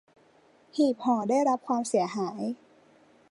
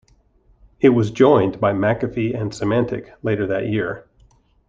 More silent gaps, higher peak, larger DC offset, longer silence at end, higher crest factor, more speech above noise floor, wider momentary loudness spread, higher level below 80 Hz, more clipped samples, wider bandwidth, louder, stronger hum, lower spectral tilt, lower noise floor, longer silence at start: neither; second, -12 dBFS vs -2 dBFS; neither; about the same, 0.75 s vs 0.65 s; about the same, 16 dB vs 18 dB; second, 34 dB vs 38 dB; about the same, 11 LU vs 11 LU; second, -80 dBFS vs -50 dBFS; neither; first, 11.5 kHz vs 7.8 kHz; second, -28 LUFS vs -19 LUFS; neither; second, -5.5 dB/octave vs -7.5 dB/octave; first, -61 dBFS vs -56 dBFS; about the same, 0.75 s vs 0.8 s